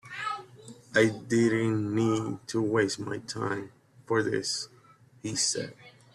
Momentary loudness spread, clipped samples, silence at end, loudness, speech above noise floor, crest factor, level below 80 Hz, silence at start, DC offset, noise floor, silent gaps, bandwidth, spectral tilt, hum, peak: 14 LU; under 0.1%; 0.25 s; -29 LUFS; 30 dB; 20 dB; -66 dBFS; 0.05 s; under 0.1%; -58 dBFS; none; 12.5 kHz; -4.5 dB/octave; none; -10 dBFS